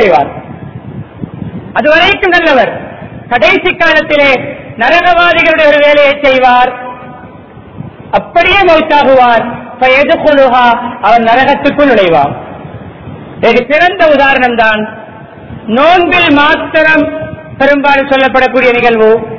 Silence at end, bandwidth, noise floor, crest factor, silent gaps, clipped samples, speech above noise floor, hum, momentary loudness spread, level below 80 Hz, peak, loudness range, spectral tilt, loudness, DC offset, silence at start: 0 s; 6 kHz; -31 dBFS; 8 dB; none; 3%; 24 dB; none; 20 LU; -36 dBFS; 0 dBFS; 3 LU; -5.5 dB/octave; -7 LUFS; 1%; 0 s